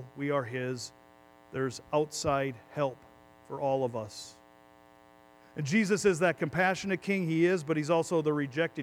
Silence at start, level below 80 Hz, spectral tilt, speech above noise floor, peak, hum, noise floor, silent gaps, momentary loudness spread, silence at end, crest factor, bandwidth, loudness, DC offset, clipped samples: 0 s; -64 dBFS; -5.5 dB/octave; 28 dB; -14 dBFS; none; -58 dBFS; none; 13 LU; 0 s; 18 dB; 16 kHz; -30 LUFS; under 0.1%; under 0.1%